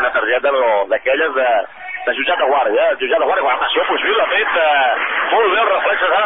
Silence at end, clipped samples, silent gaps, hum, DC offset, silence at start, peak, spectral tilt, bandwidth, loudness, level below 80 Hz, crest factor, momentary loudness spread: 0 s; under 0.1%; none; none; 0.6%; 0 s; -4 dBFS; 7 dB/octave; 3.9 kHz; -15 LUFS; -54 dBFS; 12 dB; 3 LU